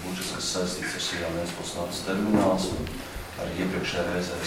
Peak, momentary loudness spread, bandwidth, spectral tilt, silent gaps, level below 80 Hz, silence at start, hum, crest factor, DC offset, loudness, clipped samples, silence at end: -8 dBFS; 10 LU; 16.5 kHz; -4 dB/octave; none; -46 dBFS; 0 s; none; 20 dB; under 0.1%; -28 LUFS; under 0.1%; 0 s